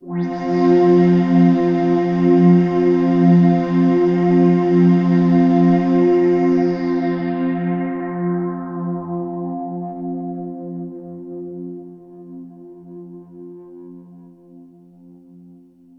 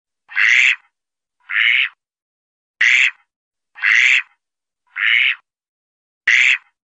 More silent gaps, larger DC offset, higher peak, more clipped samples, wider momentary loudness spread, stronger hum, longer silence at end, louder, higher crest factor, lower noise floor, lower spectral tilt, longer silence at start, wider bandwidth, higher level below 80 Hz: second, none vs 2.22-2.74 s, 3.36-3.51 s, 5.68-6.21 s; neither; about the same, -2 dBFS vs -2 dBFS; neither; first, 20 LU vs 11 LU; neither; first, 1.4 s vs 0.25 s; about the same, -16 LUFS vs -14 LUFS; about the same, 14 dB vs 16 dB; second, -46 dBFS vs -85 dBFS; first, -10 dB/octave vs 5 dB/octave; second, 0.05 s vs 0.3 s; second, 5.8 kHz vs 8.4 kHz; first, -56 dBFS vs -76 dBFS